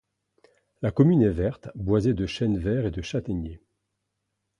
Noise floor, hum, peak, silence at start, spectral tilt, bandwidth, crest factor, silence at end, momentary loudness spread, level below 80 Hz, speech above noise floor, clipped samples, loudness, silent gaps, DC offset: -80 dBFS; none; -6 dBFS; 0.8 s; -8 dB/octave; 10.5 kHz; 20 dB; 1 s; 13 LU; -44 dBFS; 56 dB; under 0.1%; -25 LUFS; none; under 0.1%